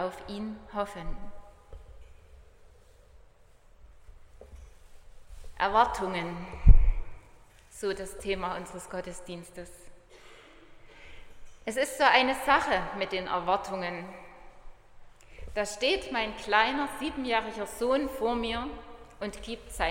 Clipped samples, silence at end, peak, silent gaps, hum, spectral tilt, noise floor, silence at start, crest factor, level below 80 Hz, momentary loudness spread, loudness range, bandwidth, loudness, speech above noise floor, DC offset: under 0.1%; 0 s; -2 dBFS; none; none; -4.5 dB/octave; -57 dBFS; 0 s; 28 dB; -34 dBFS; 21 LU; 13 LU; 16 kHz; -29 LUFS; 29 dB; under 0.1%